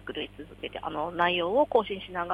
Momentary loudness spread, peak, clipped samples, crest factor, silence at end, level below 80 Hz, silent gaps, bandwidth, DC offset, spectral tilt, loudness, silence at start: 14 LU; -10 dBFS; under 0.1%; 20 dB; 0 s; -56 dBFS; none; 11 kHz; under 0.1%; -6.5 dB/octave; -28 LUFS; 0 s